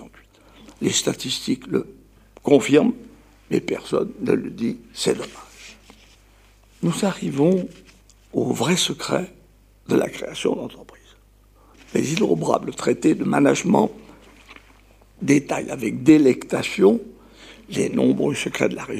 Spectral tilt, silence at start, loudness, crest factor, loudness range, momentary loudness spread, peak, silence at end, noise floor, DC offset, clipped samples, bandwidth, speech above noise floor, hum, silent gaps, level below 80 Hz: -5 dB/octave; 0 s; -21 LUFS; 20 dB; 6 LU; 12 LU; -2 dBFS; 0 s; -53 dBFS; under 0.1%; under 0.1%; 15.5 kHz; 33 dB; none; none; -54 dBFS